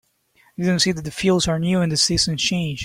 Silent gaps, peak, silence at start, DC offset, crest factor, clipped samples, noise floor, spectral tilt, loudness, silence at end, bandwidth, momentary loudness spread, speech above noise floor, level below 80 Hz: none; -4 dBFS; 0.6 s; under 0.1%; 16 dB; under 0.1%; -59 dBFS; -4 dB/octave; -19 LUFS; 0 s; 15.5 kHz; 5 LU; 39 dB; -44 dBFS